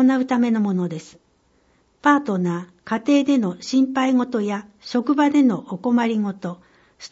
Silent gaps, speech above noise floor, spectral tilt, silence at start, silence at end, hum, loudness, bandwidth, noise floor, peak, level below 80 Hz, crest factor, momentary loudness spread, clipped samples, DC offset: none; 41 dB; -6.5 dB/octave; 0 s; 0.05 s; none; -20 LUFS; 8 kHz; -61 dBFS; -4 dBFS; -66 dBFS; 18 dB; 13 LU; under 0.1%; under 0.1%